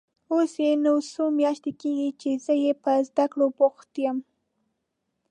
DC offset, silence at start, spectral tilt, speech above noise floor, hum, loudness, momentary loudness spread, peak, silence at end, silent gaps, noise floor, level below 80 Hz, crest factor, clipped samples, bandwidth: under 0.1%; 0.3 s; -5 dB/octave; 55 dB; none; -25 LUFS; 7 LU; -8 dBFS; 1.1 s; none; -79 dBFS; -82 dBFS; 16 dB; under 0.1%; 9.8 kHz